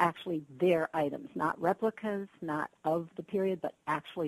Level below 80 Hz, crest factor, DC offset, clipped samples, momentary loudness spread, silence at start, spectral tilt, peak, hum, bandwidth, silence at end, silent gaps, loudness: -74 dBFS; 20 dB; under 0.1%; under 0.1%; 8 LU; 0 s; -7 dB/octave; -12 dBFS; none; 13 kHz; 0 s; none; -33 LUFS